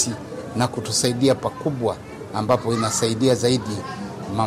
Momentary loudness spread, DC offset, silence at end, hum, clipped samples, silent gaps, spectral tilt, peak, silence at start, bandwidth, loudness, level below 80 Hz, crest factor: 11 LU; under 0.1%; 0 s; none; under 0.1%; none; -4.5 dB/octave; -6 dBFS; 0 s; 15.5 kHz; -22 LUFS; -54 dBFS; 16 dB